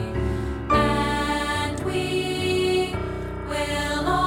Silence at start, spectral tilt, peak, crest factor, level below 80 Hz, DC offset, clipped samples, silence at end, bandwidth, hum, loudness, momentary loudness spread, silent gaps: 0 s; -5 dB/octave; -8 dBFS; 16 dB; -36 dBFS; under 0.1%; under 0.1%; 0 s; 17 kHz; none; -24 LUFS; 8 LU; none